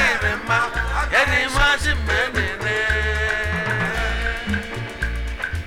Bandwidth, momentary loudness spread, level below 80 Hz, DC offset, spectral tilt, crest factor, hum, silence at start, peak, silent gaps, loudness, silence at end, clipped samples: 17.5 kHz; 9 LU; -28 dBFS; under 0.1%; -4 dB/octave; 18 dB; none; 0 s; -4 dBFS; none; -20 LUFS; 0 s; under 0.1%